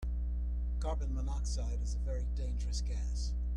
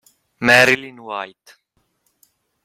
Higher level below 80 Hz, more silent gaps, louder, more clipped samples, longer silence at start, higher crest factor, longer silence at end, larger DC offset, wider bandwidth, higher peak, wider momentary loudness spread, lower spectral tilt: first, -34 dBFS vs -58 dBFS; neither; second, -38 LUFS vs -14 LUFS; neither; second, 0 s vs 0.4 s; second, 10 dB vs 20 dB; second, 0 s vs 1.4 s; neither; second, 9.6 kHz vs 16 kHz; second, -26 dBFS vs 0 dBFS; second, 1 LU vs 18 LU; first, -6 dB/octave vs -3.5 dB/octave